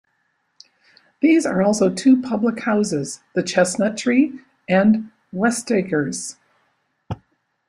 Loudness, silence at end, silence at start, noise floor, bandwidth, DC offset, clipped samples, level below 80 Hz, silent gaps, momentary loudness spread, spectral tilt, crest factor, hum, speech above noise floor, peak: -19 LUFS; 0.55 s; 1.2 s; -69 dBFS; 13.5 kHz; under 0.1%; under 0.1%; -60 dBFS; none; 16 LU; -5 dB/octave; 18 dB; none; 50 dB; -2 dBFS